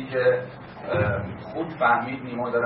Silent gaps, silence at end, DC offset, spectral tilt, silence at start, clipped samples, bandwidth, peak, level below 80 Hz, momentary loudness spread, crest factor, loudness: none; 0 s; under 0.1%; -11 dB/octave; 0 s; under 0.1%; 5.6 kHz; -8 dBFS; -52 dBFS; 12 LU; 18 dB; -25 LUFS